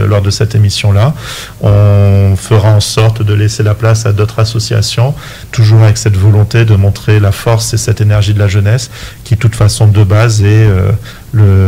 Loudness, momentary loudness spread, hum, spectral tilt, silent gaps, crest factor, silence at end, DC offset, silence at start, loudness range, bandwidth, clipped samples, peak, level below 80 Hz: -9 LUFS; 7 LU; none; -6 dB/octave; none; 8 dB; 0 s; under 0.1%; 0 s; 1 LU; 15 kHz; under 0.1%; 0 dBFS; -30 dBFS